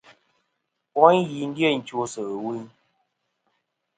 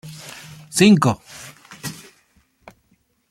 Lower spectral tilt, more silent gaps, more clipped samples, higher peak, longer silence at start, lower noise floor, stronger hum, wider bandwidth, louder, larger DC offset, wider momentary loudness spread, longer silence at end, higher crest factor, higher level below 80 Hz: about the same, -5.5 dB/octave vs -5 dB/octave; neither; neither; about the same, 0 dBFS vs -2 dBFS; first, 0.95 s vs 0.05 s; first, -78 dBFS vs -63 dBFS; neither; second, 9.4 kHz vs 15 kHz; second, -23 LUFS vs -16 LUFS; neither; second, 14 LU vs 25 LU; about the same, 1.3 s vs 1.4 s; about the same, 24 dB vs 20 dB; second, -72 dBFS vs -58 dBFS